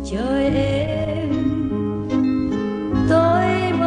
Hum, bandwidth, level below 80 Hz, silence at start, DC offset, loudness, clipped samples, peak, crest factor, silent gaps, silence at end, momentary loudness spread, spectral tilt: none; 10 kHz; -36 dBFS; 0 s; under 0.1%; -20 LUFS; under 0.1%; -4 dBFS; 14 dB; none; 0 s; 7 LU; -7.5 dB/octave